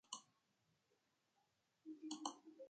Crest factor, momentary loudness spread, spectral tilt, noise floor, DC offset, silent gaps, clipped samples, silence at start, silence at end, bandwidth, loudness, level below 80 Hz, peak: 28 dB; 11 LU; -1.5 dB/octave; -84 dBFS; under 0.1%; none; under 0.1%; 0.1 s; 0 s; 9 kHz; -53 LUFS; under -90 dBFS; -28 dBFS